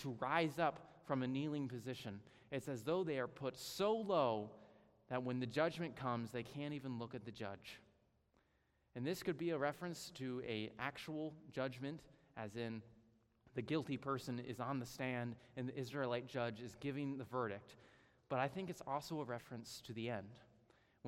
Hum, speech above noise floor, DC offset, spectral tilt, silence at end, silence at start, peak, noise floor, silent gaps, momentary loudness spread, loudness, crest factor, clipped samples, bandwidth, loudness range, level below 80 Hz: none; 36 dB; under 0.1%; -6 dB/octave; 0 s; 0 s; -22 dBFS; -79 dBFS; none; 11 LU; -44 LUFS; 22 dB; under 0.1%; 16 kHz; 5 LU; -78 dBFS